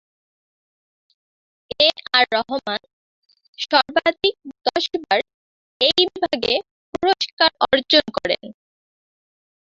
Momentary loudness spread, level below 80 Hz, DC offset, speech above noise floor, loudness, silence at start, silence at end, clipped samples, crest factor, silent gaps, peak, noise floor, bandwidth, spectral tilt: 10 LU; -58 dBFS; under 0.1%; over 70 dB; -19 LUFS; 1.8 s; 1.25 s; under 0.1%; 22 dB; 2.93-3.22 s, 3.48-3.53 s, 5.34-5.80 s, 6.71-6.93 s, 7.33-7.37 s; -2 dBFS; under -90 dBFS; 7.8 kHz; -3 dB/octave